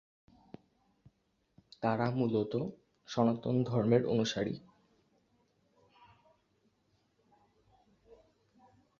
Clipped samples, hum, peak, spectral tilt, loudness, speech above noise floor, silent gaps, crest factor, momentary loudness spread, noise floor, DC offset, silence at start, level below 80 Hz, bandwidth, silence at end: under 0.1%; none; -14 dBFS; -7 dB/octave; -33 LUFS; 45 dB; none; 22 dB; 10 LU; -76 dBFS; under 0.1%; 1.8 s; -70 dBFS; 7.4 kHz; 4.4 s